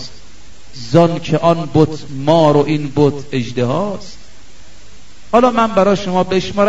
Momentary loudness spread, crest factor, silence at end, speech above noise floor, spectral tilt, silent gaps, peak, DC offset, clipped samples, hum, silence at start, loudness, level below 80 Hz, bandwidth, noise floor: 9 LU; 16 dB; 0 s; 28 dB; -7 dB/octave; none; 0 dBFS; 4%; 0.2%; none; 0 s; -14 LUFS; -44 dBFS; 8 kHz; -42 dBFS